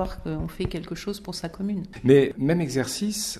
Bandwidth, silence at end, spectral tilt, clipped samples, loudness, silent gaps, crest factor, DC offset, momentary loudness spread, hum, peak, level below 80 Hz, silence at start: 13.5 kHz; 0 s; -5.5 dB/octave; under 0.1%; -25 LUFS; none; 20 dB; under 0.1%; 14 LU; none; -6 dBFS; -44 dBFS; 0 s